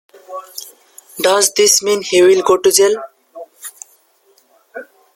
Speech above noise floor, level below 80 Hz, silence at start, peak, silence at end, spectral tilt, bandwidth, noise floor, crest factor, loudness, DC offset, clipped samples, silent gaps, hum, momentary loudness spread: 42 dB; -62 dBFS; 0.3 s; 0 dBFS; 0.3 s; -1.5 dB/octave; 16.5 kHz; -55 dBFS; 16 dB; -12 LUFS; under 0.1%; under 0.1%; none; none; 24 LU